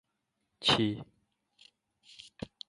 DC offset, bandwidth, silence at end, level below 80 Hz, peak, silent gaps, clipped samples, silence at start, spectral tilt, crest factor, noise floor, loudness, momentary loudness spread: under 0.1%; 11 kHz; 0.5 s; -64 dBFS; -12 dBFS; none; under 0.1%; 0.6 s; -4.5 dB/octave; 26 dB; -82 dBFS; -29 LUFS; 25 LU